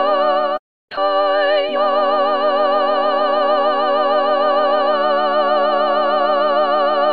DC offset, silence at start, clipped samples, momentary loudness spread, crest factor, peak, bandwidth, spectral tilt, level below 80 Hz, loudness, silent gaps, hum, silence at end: 1%; 0 s; under 0.1%; 1 LU; 12 dB; -4 dBFS; 5 kHz; -5.5 dB/octave; -64 dBFS; -16 LUFS; 0.59-0.88 s; none; 0 s